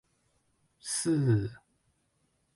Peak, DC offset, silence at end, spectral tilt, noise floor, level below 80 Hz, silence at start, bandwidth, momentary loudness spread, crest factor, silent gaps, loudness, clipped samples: -16 dBFS; under 0.1%; 1 s; -5.5 dB/octave; -74 dBFS; -62 dBFS; 0.85 s; 11.5 kHz; 14 LU; 18 dB; none; -29 LUFS; under 0.1%